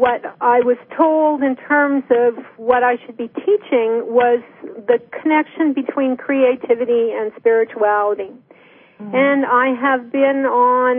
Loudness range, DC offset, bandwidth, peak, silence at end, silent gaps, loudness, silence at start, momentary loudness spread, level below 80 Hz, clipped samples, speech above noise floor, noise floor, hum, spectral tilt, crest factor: 2 LU; under 0.1%; 3.7 kHz; -2 dBFS; 0 s; none; -17 LUFS; 0 s; 7 LU; -64 dBFS; under 0.1%; 31 dB; -47 dBFS; none; -10 dB/octave; 14 dB